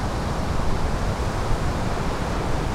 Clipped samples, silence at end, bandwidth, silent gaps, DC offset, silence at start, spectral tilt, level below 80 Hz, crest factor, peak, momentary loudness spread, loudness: under 0.1%; 0 s; 14 kHz; none; under 0.1%; 0 s; -6 dB/octave; -26 dBFS; 14 dB; -8 dBFS; 1 LU; -26 LUFS